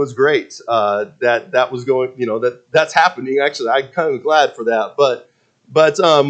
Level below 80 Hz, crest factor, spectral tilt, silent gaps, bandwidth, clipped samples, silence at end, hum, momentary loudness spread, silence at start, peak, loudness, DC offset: -68 dBFS; 16 dB; -4 dB/octave; none; 8.8 kHz; under 0.1%; 0 s; none; 6 LU; 0 s; 0 dBFS; -16 LUFS; under 0.1%